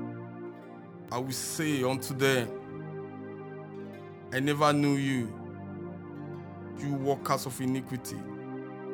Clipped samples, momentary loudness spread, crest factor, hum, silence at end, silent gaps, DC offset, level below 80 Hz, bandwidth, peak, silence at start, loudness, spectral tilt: under 0.1%; 16 LU; 22 dB; none; 0 s; none; under 0.1%; -70 dBFS; over 20 kHz; -10 dBFS; 0 s; -32 LUFS; -5 dB/octave